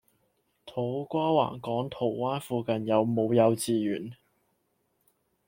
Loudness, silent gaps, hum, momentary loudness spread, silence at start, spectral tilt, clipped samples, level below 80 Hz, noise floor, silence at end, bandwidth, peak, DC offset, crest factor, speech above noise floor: -28 LUFS; none; none; 10 LU; 0.65 s; -6.5 dB/octave; under 0.1%; -70 dBFS; -74 dBFS; 1.35 s; 16.5 kHz; -10 dBFS; under 0.1%; 20 dB; 47 dB